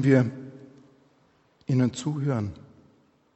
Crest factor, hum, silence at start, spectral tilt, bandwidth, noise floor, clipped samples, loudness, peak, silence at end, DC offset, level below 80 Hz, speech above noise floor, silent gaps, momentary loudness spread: 20 dB; none; 0 s; -7.5 dB/octave; 8.4 kHz; -63 dBFS; under 0.1%; -26 LUFS; -8 dBFS; 0.8 s; under 0.1%; -62 dBFS; 40 dB; none; 23 LU